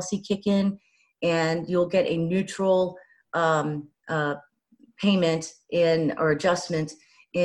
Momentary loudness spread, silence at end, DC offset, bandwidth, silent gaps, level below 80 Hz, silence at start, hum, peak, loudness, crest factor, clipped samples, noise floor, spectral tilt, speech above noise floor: 9 LU; 0 s; under 0.1%; 11.5 kHz; none; -62 dBFS; 0 s; none; -8 dBFS; -25 LUFS; 16 dB; under 0.1%; -60 dBFS; -5.5 dB/octave; 35 dB